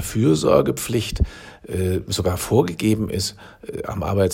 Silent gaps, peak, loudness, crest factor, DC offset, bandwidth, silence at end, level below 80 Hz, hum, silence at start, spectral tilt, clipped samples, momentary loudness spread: none; -2 dBFS; -21 LUFS; 20 dB; under 0.1%; 16.5 kHz; 0 s; -36 dBFS; none; 0 s; -5.5 dB/octave; under 0.1%; 13 LU